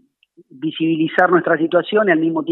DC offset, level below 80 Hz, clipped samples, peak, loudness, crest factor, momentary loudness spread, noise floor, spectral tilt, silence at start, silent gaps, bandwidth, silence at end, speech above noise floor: under 0.1%; -68 dBFS; under 0.1%; 0 dBFS; -16 LUFS; 18 dB; 8 LU; -53 dBFS; -8.5 dB/octave; 0.55 s; none; 4.1 kHz; 0 s; 37 dB